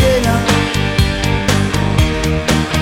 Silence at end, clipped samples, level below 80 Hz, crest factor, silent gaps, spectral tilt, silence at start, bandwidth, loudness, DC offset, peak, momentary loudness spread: 0 s; under 0.1%; -22 dBFS; 14 dB; none; -5 dB/octave; 0 s; 17 kHz; -14 LUFS; 0.3%; 0 dBFS; 2 LU